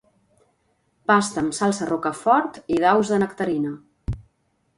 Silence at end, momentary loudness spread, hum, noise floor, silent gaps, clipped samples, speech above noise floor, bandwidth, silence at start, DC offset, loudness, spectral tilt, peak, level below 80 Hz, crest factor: 0.55 s; 15 LU; none; -68 dBFS; none; under 0.1%; 48 dB; 11.5 kHz; 1.1 s; under 0.1%; -22 LUFS; -5 dB/octave; -4 dBFS; -46 dBFS; 20 dB